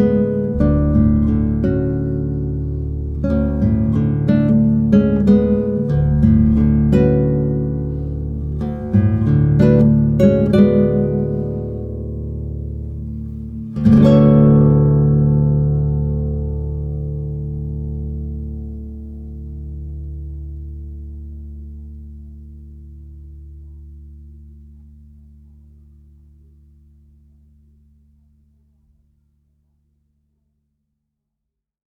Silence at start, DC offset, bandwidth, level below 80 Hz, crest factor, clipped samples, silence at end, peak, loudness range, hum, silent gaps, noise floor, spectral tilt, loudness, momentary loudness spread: 0 s; under 0.1%; 4.7 kHz; -28 dBFS; 16 dB; under 0.1%; 7.2 s; 0 dBFS; 19 LU; none; none; -80 dBFS; -11 dB/octave; -16 LUFS; 19 LU